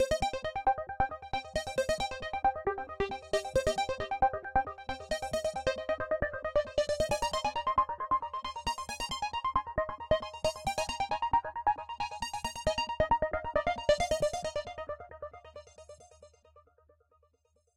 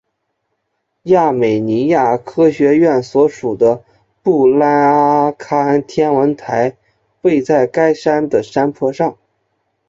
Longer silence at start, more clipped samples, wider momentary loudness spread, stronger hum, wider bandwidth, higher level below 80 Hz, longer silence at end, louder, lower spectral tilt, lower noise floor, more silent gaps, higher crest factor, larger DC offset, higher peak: second, 0 s vs 1.05 s; neither; about the same, 8 LU vs 7 LU; neither; first, 15 kHz vs 7.8 kHz; first, -48 dBFS vs -56 dBFS; first, 1.15 s vs 0.75 s; second, -33 LUFS vs -14 LUFS; second, -3.5 dB/octave vs -7.5 dB/octave; about the same, -73 dBFS vs -70 dBFS; neither; first, 20 dB vs 12 dB; neither; second, -14 dBFS vs -2 dBFS